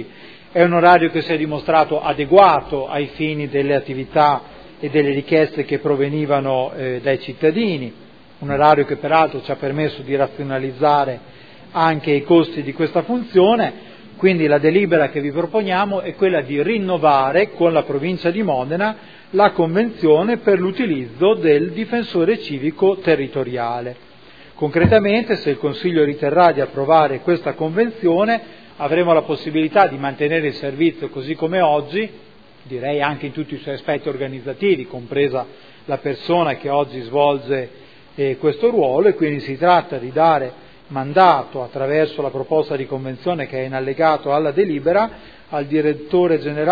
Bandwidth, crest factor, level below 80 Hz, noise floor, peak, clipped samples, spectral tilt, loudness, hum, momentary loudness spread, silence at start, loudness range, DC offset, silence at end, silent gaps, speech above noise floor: 5 kHz; 18 dB; -54 dBFS; -44 dBFS; 0 dBFS; under 0.1%; -9 dB/octave; -18 LUFS; none; 10 LU; 0 s; 4 LU; 0.4%; 0 s; none; 27 dB